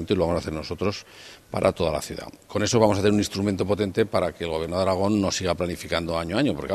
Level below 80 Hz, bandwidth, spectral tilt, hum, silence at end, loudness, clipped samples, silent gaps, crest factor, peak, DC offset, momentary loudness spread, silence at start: -46 dBFS; 14 kHz; -5 dB/octave; none; 0 s; -24 LUFS; under 0.1%; none; 20 dB; -4 dBFS; under 0.1%; 11 LU; 0 s